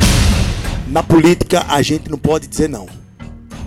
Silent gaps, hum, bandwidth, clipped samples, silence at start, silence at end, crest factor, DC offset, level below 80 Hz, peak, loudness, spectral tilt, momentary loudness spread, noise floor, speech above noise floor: none; none; 16.5 kHz; under 0.1%; 0 s; 0 s; 12 dB; under 0.1%; -22 dBFS; -4 dBFS; -15 LUFS; -5 dB/octave; 22 LU; -34 dBFS; 20 dB